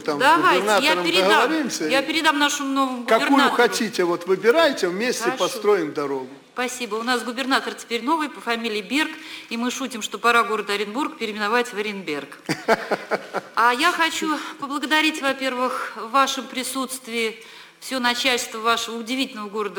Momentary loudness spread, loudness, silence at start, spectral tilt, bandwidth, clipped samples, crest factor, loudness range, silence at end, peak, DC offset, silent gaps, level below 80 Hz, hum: 10 LU; -21 LUFS; 0 s; -2.5 dB/octave; 19.5 kHz; under 0.1%; 18 dB; 5 LU; 0 s; -4 dBFS; under 0.1%; none; -66 dBFS; none